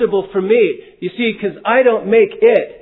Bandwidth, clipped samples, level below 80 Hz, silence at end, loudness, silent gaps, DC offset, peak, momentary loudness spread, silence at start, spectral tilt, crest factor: 4.1 kHz; under 0.1%; -56 dBFS; 0.05 s; -14 LUFS; none; under 0.1%; 0 dBFS; 8 LU; 0 s; -9 dB/octave; 14 dB